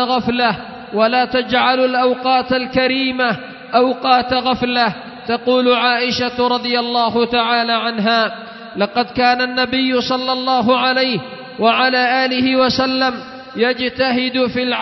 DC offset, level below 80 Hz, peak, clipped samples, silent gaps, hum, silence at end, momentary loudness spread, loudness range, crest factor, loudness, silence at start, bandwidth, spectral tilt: under 0.1%; -50 dBFS; 0 dBFS; under 0.1%; none; none; 0 s; 6 LU; 1 LU; 16 dB; -16 LUFS; 0 s; 6.2 kHz; -5 dB/octave